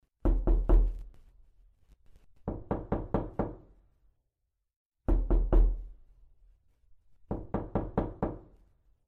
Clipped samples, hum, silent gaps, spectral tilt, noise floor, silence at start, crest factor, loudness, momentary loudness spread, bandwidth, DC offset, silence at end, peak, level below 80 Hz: under 0.1%; none; 4.76-4.90 s; -11 dB/octave; -83 dBFS; 0.25 s; 20 dB; -33 LUFS; 15 LU; 2.4 kHz; under 0.1%; 0.65 s; -12 dBFS; -32 dBFS